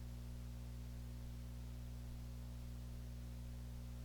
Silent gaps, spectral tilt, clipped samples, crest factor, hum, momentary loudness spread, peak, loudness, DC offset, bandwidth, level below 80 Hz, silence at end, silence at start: none; -6.5 dB/octave; under 0.1%; 10 dB; 60 Hz at -50 dBFS; 0 LU; -40 dBFS; -52 LUFS; under 0.1%; over 20 kHz; -50 dBFS; 0 s; 0 s